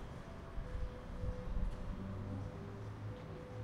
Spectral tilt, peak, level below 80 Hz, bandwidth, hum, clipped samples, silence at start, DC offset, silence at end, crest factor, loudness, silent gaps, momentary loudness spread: -8 dB/octave; -26 dBFS; -46 dBFS; 10.5 kHz; none; under 0.1%; 0 s; under 0.1%; 0 s; 18 dB; -47 LUFS; none; 5 LU